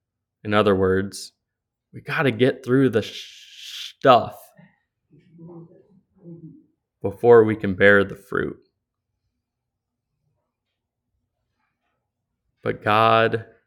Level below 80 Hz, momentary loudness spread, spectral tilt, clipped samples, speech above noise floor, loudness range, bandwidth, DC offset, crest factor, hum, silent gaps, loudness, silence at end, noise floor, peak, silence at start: -64 dBFS; 21 LU; -6 dB/octave; under 0.1%; 63 dB; 10 LU; 14.5 kHz; under 0.1%; 22 dB; none; none; -19 LUFS; 0.25 s; -82 dBFS; 0 dBFS; 0.45 s